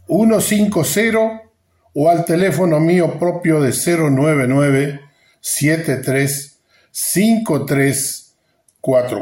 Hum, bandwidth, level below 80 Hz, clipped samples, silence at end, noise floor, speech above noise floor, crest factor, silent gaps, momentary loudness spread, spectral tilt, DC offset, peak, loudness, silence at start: none; 16.5 kHz; -56 dBFS; under 0.1%; 0 s; -60 dBFS; 45 dB; 12 dB; none; 10 LU; -5.5 dB/octave; under 0.1%; -4 dBFS; -16 LUFS; 0.1 s